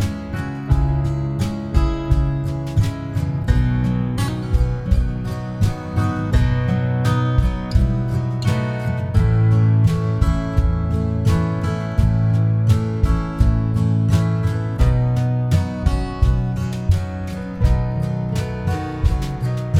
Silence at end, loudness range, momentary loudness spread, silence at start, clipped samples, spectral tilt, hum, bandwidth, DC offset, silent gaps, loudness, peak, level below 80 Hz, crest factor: 0 s; 3 LU; 6 LU; 0 s; under 0.1%; -8 dB/octave; none; 13 kHz; under 0.1%; none; -20 LUFS; -4 dBFS; -24 dBFS; 14 dB